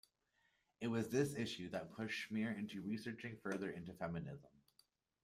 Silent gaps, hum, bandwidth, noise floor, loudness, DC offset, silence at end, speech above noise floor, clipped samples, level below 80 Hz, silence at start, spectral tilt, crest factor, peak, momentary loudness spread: none; none; 15.5 kHz; -81 dBFS; -44 LUFS; under 0.1%; 0.75 s; 38 dB; under 0.1%; -76 dBFS; 0.8 s; -5.5 dB/octave; 20 dB; -24 dBFS; 9 LU